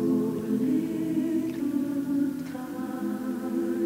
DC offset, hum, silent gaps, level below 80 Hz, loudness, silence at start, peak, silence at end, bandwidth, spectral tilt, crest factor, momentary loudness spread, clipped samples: under 0.1%; none; none; -66 dBFS; -29 LUFS; 0 s; -14 dBFS; 0 s; 16 kHz; -7.5 dB/octave; 12 dB; 7 LU; under 0.1%